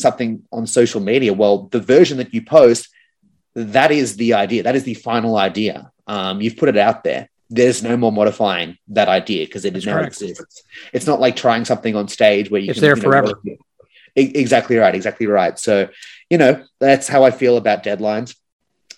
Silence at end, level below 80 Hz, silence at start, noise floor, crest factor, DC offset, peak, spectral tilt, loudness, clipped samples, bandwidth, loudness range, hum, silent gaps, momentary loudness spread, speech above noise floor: 0.65 s; -60 dBFS; 0 s; -62 dBFS; 16 dB; under 0.1%; 0 dBFS; -5 dB/octave; -16 LUFS; under 0.1%; 12.5 kHz; 4 LU; none; none; 11 LU; 46 dB